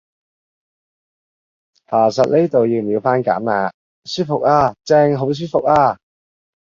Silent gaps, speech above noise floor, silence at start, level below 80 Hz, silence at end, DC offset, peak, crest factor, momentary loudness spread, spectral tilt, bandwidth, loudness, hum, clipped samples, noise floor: 3.74-4.02 s; over 75 dB; 1.9 s; -52 dBFS; 0.7 s; under 0.1%; -2 dBFS; 16 dB; 7 LU; -6.5 dB/octave; 7.6 kHz; -16 LUFS; none; under 0.1%; under -90 dBFS